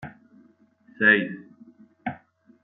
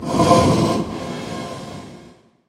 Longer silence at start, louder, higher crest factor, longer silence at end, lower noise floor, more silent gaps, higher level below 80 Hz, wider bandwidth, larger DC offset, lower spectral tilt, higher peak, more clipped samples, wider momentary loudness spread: about the same, 0 s vs 0 s; second, -22 LUFS vs -18 LUFS; about the same, 24 dB vs 20 dB; about the same, 0.5 s vs 0.4 s; first, -58 dBFS vs -47 dBFS; neither; second, -72 dBFS vs -42 dBFS; second, 4.1 kHz vs 16 kHz; neither; second, -3 dB/octave vs -6 dB/octave; second, -4 dBFS vs 0 dBFS; neither; first, 25 LU vs 21 LU